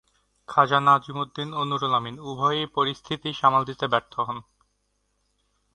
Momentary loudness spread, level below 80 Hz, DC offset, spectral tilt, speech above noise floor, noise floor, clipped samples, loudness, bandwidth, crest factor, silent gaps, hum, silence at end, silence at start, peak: 12 LU; -64 dBFS; under 0.1%; -5.5 dB/octave; 48 dB; -72 dBFS; under 0.1%; -24 LUFS; 10.5 kHz; 22 dB; none; 50 Hz at -55 dBFS; 1.35 s; 0.5 s; -4 dBFS